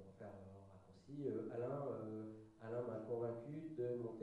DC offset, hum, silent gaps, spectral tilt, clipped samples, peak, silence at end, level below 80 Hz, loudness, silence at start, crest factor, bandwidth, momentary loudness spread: under 0.1%; none; none; -9.5 dB/octave; under 0.1%; -32 dBFS; 0 s; -82 dBFS; -47 LUFS; 0 s; 16 dB; 11 kHz; 14 LU